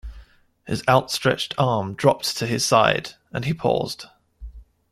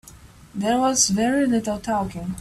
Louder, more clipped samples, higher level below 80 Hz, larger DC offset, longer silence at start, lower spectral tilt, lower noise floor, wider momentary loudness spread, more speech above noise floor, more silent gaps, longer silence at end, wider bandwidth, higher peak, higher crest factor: about the same, -21 LUFS vs -21 LUFS; neither; about the same, -46 dBFS vs -48 dBFS; neither; about the same, 0.05 s vs 0.05 s; about the same, -4.5 dB/octave vs -3.5 dB/octave; about the same, -49 dBFS vs -46 dBFS; about the same, 12 LU vs 10 LU; about the same, 28 dB vs 25 dB; neither; first, 0.3 s vs 0 s; about the same, 15.5 kHz vs 15 kHz; first, -2 dBFS vs -6 dBFS; first, 22 dB vs 16 dB